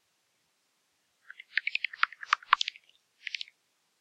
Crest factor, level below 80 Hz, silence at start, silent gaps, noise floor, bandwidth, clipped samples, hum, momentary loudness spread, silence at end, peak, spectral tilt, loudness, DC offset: 30 dB; -82 dBFS; 1.55 s; none; -75 dBFS; 12 kHz; under 0.1%; none; 17 LU; 0.6 s; -6 dBFS; 4 dB/octave; -31 LUFS; under 0.1%